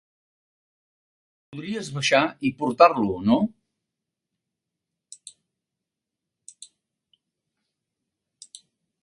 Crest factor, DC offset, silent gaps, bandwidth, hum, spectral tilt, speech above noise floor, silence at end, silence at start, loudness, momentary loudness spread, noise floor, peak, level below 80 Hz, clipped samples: 26 dB; under 0.1%; none; 11.5 kHz; none; -5 dB/octave; 65 dB; 5.55 s; 1.5 s; -22 LUFS; 26 LU; -86 dBFS; -2 dBFS; -62 dBFS; under 0.1%